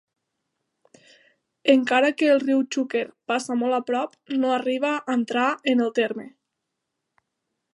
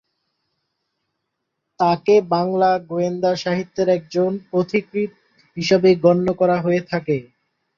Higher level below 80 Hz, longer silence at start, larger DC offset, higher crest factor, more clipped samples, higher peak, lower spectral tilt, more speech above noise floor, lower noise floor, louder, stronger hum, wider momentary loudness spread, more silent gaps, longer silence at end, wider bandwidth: second, -80 dBFS vs -60 dBFS; second, 1.65 s vs 1.8 s; neither; about the same, 20 dB vs 18 dB; neither; second, -6 dBFS vs -2 dBFS; second, -3.5 dB/octave vs -6.5 dB/octave; about the same, 59 dB vs 59 dB; first, -81 dBFS vs -77 dBFS; second, -23 LUFS vs -19 LUFS; neither; about the same, 8 LU vs 10 LU; neither; first, 1.45 s vs 0.55 s; first, 11.5 kHz vs 7.2 kHz